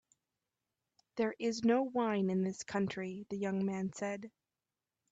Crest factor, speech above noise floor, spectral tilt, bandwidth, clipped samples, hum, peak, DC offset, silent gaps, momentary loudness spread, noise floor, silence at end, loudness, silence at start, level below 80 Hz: 18 dB; over 55 dB; -6 dB/octave; 8 kHz; under 0.1%; none; -20 dBFS; under 0.1%; none; 10 LU; under -90 dBFS; 0.85 s; -36 LUFS; 1.15 s; -76 dBFS